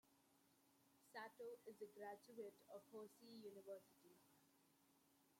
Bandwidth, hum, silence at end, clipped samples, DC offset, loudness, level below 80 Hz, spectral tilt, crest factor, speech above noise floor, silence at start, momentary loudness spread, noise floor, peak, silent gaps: 16.5 kHz; none; 0 s; under 0.1%; under 0.1%; -60 LUFS; under -90 dBFS; -4 dB/octave; 18 dB; 20 dB; 0.05 s; 4 LU; -79 dBFS; -44 dBFS; none